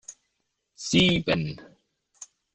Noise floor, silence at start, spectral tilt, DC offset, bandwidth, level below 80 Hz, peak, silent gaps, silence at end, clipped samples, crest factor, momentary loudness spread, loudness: -78 dBFS; 0.1 s; -4.5 dB/octave; under 0.1%; 9.8 kHz; -52 dBFS; -6 dBFS; none; 0.3 s; under 0.1%; 22 dB; 26 LU; -23 LUFS